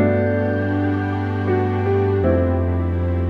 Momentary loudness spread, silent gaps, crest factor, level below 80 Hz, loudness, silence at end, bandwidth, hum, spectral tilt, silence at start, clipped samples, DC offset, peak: 4 LU; none; 12 dB; -34 dBFS; -20 LUFS; 0 s; 4.7 kHz; none; -10.5 dB/octave; 0 s; under 0.1%; under 0.1%; -6 dBFS